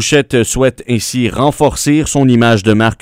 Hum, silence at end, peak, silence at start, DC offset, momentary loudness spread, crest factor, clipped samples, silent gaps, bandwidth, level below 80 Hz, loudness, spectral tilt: none; 0.05 s; 0 dBFS; 0 s; under 0.1%; 5 LU; 12 dB; 0.2%; none; 16.5 kHz; -32 dBFS; -12 LUFS; -5 dB/octave